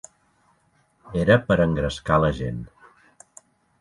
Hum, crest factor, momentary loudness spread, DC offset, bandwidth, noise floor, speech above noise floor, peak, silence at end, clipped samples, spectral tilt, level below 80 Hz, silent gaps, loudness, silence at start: none; 20 dB; 14 LU; under 0.1%; 11.5 kHz; -64 dBFS; 43 dB; -4 dBFS; 1.15 s; under 0.1%; -7 dB/octave; -42 dBFS; none; -22 LUFS; 1.05 s